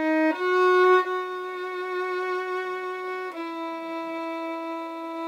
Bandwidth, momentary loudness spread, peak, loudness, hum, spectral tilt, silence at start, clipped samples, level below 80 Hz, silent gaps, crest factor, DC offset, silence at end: 9.8 kHz; 13 LU; -10 dBFS; -26 LUFS; none; -3 dB/octave; 0 s; under 0.1%; under -90 dBFS; none; 16 dB; under 0.1%; 0 s